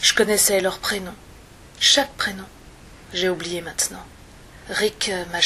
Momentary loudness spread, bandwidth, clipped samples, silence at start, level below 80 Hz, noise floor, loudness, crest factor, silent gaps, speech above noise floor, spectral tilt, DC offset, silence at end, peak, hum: 13 LU; 15 kHz; under 0.1%; 0 s; -48 dBFS; -45 dBFS; -21 LUFS; 22 dB; none; 23 dB; -1 dB/octave; under 0.1%; 0 s; -2 dBFS; none